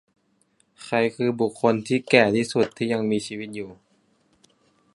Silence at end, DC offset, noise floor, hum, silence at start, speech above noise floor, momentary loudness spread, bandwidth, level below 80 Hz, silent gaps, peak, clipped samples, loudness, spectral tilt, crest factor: 1.2 s; under 0.1%; -66 dBFS; none; 0.8 s; 43 dB; 16 LU; 11.5 kHz; -64 dBFS; none; -2 dBFS; under 0.1%; -23 LUFS; -5.5 dB/octave; 24 dB